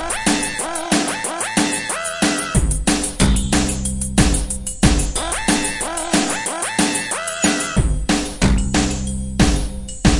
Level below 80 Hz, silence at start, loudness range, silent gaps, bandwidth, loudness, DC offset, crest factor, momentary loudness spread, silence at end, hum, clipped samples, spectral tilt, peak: -24 dBFS; 0 s; 1 LU; none; 11.5 kHz; -19 LUFS; 0.3%; 18 dB; 5 LU; 0 s; none; under 0.1%; -3.5 dB/octave; 0 dBFS